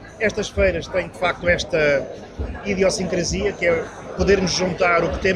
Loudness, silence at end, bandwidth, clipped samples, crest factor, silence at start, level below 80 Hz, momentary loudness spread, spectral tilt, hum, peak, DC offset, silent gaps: -20 LUFS; 0 s; 11.5 kHz; under 0.1%; 16 dB; 0 s; -34 dBFS; 8 LU; -4.5 dB/octave; none; -4 dBFS; under 0.1%; none